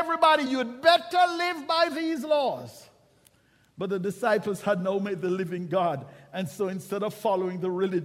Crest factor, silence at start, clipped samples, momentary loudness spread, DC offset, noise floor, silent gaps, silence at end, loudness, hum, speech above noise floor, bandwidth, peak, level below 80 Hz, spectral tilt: 22 dB; 0 s; under 0.1%; 11 LU; under 0.1%; -63 dBFS; none; 0 s; -26 LUFS; none; 37 dB; 15.5 kHz; -6 dBFS; -72 dBFS; -5 dB/octave